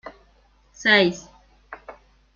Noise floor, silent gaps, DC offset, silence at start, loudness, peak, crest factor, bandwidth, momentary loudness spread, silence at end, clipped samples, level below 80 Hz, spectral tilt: -58 dBFS; none; under 0.1%; 0.05 s; -19 LUFS; -4 dBFS; 22 dB; 7.4 kHz; 25 LU; 0.45 s; under 0.1%; -58 dBFS; -4 dB/octave